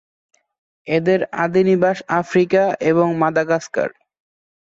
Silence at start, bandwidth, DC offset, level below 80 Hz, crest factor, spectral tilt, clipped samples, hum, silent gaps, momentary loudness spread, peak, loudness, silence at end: 0.85 s; 7.8 kHz; under 0.1%; -62 dBFS; 16 dB; -7 dB/octave; under 0.1%; none; none; 7 LU; -4 dBFS; -18 LUFS; 0.8 s